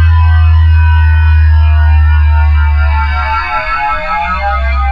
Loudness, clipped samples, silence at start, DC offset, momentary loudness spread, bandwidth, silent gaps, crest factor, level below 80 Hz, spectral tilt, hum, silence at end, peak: -10 LUFS; under 0.1%; 0 s; under 0.1%; 5 LU; 5.2 kHz; none; 8 dB; -10 dBFS; -7.5 dB/octave; none; 0 s; 0 dBFS